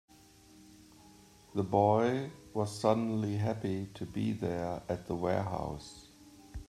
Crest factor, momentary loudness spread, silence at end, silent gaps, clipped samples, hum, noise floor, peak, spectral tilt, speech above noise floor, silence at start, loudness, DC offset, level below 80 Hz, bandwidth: 22 dB; 13 LU; 0.05 s; none; under 0.1%; none; -59 dBFS; -12 dBFS; -7 dB/octave; 27 dB; 0.6 s; -33 LUFS; under 0.1%; -58 dBFS; 14 kHz